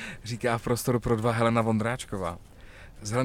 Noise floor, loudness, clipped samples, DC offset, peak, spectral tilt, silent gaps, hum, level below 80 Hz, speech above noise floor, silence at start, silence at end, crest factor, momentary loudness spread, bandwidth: -47 dBFS; -28 LUFS; under 0.1%; under 0.1%; -12 dBFS; -6 dB/octave; none; none; -48 dBFS; 20 dB; 0 s; 0 s; 16 dB; 12 LU; 16.5 kHz